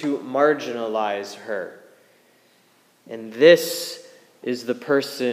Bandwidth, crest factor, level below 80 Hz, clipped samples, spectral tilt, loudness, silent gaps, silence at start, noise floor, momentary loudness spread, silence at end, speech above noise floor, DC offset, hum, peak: 15.5 kHz; 22 dB; -84 dBFS; under 0.1%; -4 dB/octave; -21 LUFS; none; 0 s; -59 dBFS; 21 LU; 0 s; 38 dB; under 0.1%; none; -2 dBFS